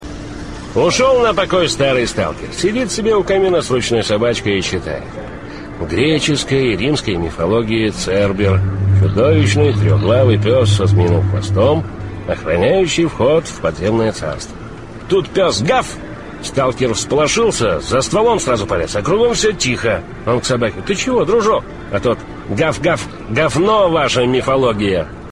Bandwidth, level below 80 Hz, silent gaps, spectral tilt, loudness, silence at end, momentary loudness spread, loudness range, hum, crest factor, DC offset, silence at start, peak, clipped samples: 11 kHz; -36 dBFS; none; -5 dB/octave; -15 LUFS; 0 s; 11 LU; 4 LU; none; 14 dB; 0.6%; 0 s; -2 dBFS; under 0.1%